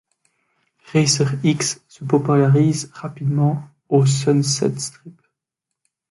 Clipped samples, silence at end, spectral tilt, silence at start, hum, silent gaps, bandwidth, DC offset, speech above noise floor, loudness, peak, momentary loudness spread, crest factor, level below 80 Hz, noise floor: under 0.1%; 1 s; -5.5 dB/octave; 0.9 s; none; none; 11.5 kHz; under 0.1%; 64 dB; -19 LUFS; -2 dBFS; 12 LU; 18 dB; -60 dBFS; -82 dBFS